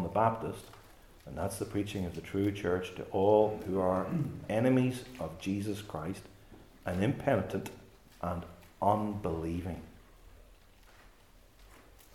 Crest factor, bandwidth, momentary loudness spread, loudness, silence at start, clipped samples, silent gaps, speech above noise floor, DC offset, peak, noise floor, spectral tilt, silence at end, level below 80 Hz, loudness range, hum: 20 dB; 17 kHz; 14 LU; -33 LUFS; 0 s; under 0.1%; none; 28 dB; under 0.1%; -14 dBFS; -60 dBFS; -7 dB/octave; 0.35 s; -58 dBFS; 6 LU; none